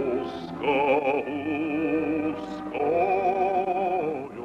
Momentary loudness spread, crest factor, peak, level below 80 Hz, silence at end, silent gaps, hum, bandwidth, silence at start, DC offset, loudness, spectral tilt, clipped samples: 8 LU; 14 dB; -12 dBFS; -58 dBFS; 0 s; none; none; 8.8 kHz; 0 s; under 0.1%; -26 LUFS; -7 dB/octave; under 0.1%